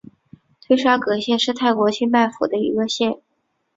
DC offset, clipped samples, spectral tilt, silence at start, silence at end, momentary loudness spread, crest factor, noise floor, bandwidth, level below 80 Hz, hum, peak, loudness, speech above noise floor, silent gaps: under 0.1%; under 0.1%; -4 dB/octave; 0.7 s; 0.6 s; 5 LU; 18 dB; -50 dBFS; 7.8 kHz; -64 dBFS; none; -2 dBFS; -19 LUFS; 31 dB; none